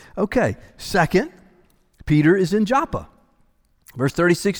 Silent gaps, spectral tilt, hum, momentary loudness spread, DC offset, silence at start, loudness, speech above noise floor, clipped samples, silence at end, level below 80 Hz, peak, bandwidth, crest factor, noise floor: none; -6 dB/octave; none; 16 LU; under 0.1%; 0.15 s; -20 LUFS; 41 dB; under 0.1%; 0 s; -42 dBFS; -4 dBFS; over 20 kHz; 16 dB; -60 dBFS